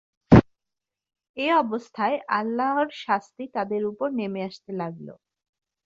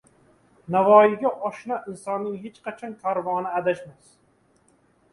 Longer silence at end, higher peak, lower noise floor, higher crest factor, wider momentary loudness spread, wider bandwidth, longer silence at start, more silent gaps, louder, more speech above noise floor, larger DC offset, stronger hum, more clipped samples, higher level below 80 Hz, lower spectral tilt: second, 0.7 s vs 1.2 s; about the same, -2 dBFS vs -2 dBFS; first, -87 dBFS vs -63 dBFS; about the same, 22 dB vs 22 dB; about the same, 16 LU vs 18 LU; second, 7.6 kHz vs 11.5 kHz; second, 0.3 s vs 0.7 s; first, 1.29-1.34 s vs none; about the same, -24 LUFS vs -23 LUFS; first, 60 dB vs 40 dB; neither; neither; neither; first, -44 dBFS vs -70 dBFS; about the same, -8 dB/octave vs -7 dB/octave